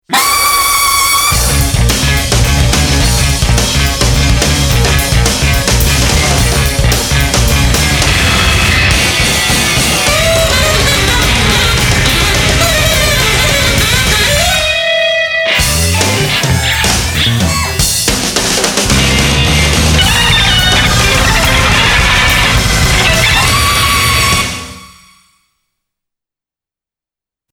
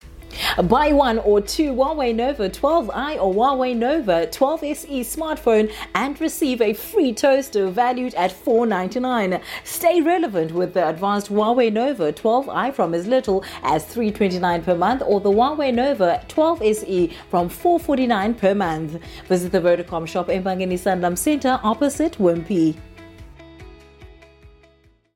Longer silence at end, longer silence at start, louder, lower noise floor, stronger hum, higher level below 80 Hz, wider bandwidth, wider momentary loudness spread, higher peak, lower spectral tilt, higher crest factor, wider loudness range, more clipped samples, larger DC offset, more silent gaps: first, 2.65 s vs 1 s; about the same, 0.1 s vs 0.05 s; first, -9 LUFS vs -20 LUFS; first, -89 dBFS vs -56 dBFS; neither; first, -18 dBFS vs -44 dBFS; first, over 20 kHz vs 17 kHz; second, 3 LU vs 6 LU; first, 0 dBFS vs -4 dBFS; second, -3 dB/octave vs -5 dB/octave; second, 10 dB vs 16 dB; about the same, 2 LU vs 2 LU; neither; neither; neither